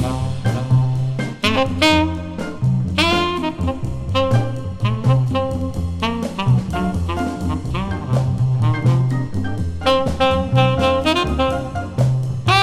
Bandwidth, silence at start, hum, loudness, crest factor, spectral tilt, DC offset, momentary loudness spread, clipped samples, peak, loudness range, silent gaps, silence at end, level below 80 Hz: 12.5 kHz; 0 s; none; -19 LUFS; 16 dB; -6.5 dB/octave; under 0.1%; 7 LU; under 0.1%; -2 dBFS; 3 LU; none; 0 s; -34 dBFS